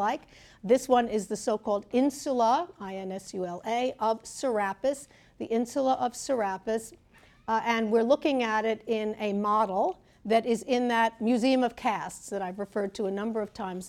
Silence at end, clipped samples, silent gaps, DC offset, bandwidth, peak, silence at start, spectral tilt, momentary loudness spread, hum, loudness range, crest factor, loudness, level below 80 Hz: 0 s; under 0.1%; none; under 0.1%; 15.5 kHz; -10 dBFS; 0 s; -4.5 dB/octave; 11 LU; none; 3 LU; 18 dB; -28 LUFS; -64 dBFS